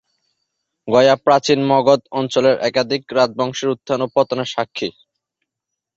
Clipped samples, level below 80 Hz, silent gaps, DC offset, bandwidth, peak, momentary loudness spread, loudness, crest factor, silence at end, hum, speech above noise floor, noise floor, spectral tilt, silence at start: under 0.1%; -60 dBFS; none; under 0.1%; 7.8 kHz; -2 dBFS; 9 LU; -17 LUFS; 16 dB; 1.05 s; none; 65 dB; -82 dBFS; -5 dB/octave; 0.85 s